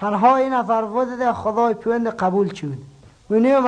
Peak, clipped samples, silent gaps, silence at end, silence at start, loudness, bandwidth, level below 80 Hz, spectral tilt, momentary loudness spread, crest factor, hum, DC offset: -4 dBFS; under 0.1%; none; 0 s; 0 s; -19 LUFS; 9.6 kHz; -56 dBFS; -7.5 dB/octave; 8 LU; 14 dB; none; under 0.1%